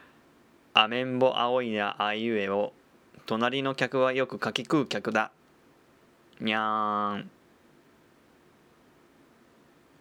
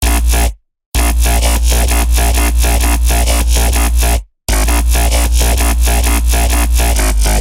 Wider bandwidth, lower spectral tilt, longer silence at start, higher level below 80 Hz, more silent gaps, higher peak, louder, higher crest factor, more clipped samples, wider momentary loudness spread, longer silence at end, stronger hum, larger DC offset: second, 12.5 kHz vs 16.5 kHz; first, -5 dB/octave vs -3.5 dB/octave; first, 0.75 s vs 0 s; second, -78 dBFS vs -12 dBFS; second, none vs 0.86-0.92 s; about the same, -4 dBFS vs -2 dBFS; second, -28 LUFS vs -13 LUFS; first, 26 dB vs 10 dB; neither; first, 10 LU vs 3 LU; first, 2.75 s vs 0 s; neither; second, under 0.1% vs 0.6%